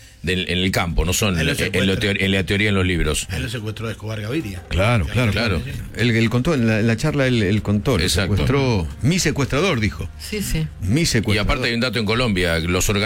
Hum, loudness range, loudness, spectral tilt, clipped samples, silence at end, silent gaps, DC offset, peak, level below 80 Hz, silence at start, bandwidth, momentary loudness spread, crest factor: none; 2 LU; -20 LUFS; -5 dB/octave; under 0.1%; 0 s; none; under 0.1%; -6 dBFS; -32 dBFS; 0 s; 16.5 kHz; 7 LU; 12 dB